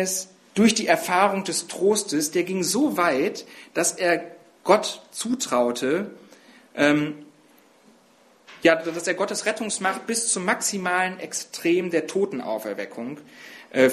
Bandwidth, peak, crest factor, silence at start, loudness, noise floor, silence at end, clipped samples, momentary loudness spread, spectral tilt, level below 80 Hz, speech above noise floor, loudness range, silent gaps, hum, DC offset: 14 kHz; -2 dBFS; 22 dB; 0 s; -23 LUFS; -57 dBFS; 0 s; under 0.1%; 12 LU; -3 dB/octave; -70 dBFS; 33 dB; 4 LU; none; none; under 0.1%